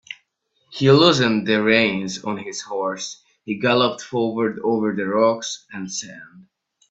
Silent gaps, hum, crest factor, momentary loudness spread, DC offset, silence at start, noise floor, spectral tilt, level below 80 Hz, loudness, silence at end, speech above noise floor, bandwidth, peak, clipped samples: none; none; 20 dB; 16 LU; under 0.1%; 0.1 s; -68 dBFS; -4.5 dB/octave; -62 dBFS; -20 LUFS; 0.5 s; 48 dB; 8.2 kHz; -2 dBFS; under 0.1%